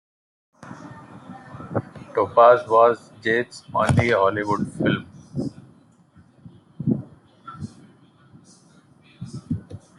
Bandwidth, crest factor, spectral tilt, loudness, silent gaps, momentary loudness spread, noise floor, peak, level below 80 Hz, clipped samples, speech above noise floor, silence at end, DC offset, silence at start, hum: 11.5 kHz; 22 dB; -7 dB/octave; -21 LUFS; none; 26 LU; -54 dBFS; -2 dBFS; -56 dBFS; under 0.1%; 35 dB; 0.2 s; under 0.1%; 0.65 s; none